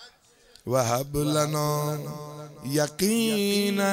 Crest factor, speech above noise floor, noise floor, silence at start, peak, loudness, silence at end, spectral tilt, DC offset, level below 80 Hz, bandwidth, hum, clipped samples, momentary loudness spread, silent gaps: 18 dB; 31 dB; -57 dBFS; 0 s; -10 dBFS; -25 LUFS; 0 s; -4.5 dB/octave; under 0.1%; -54 dBFS; 16 kHz; none; under 0.1%; 15 LU; none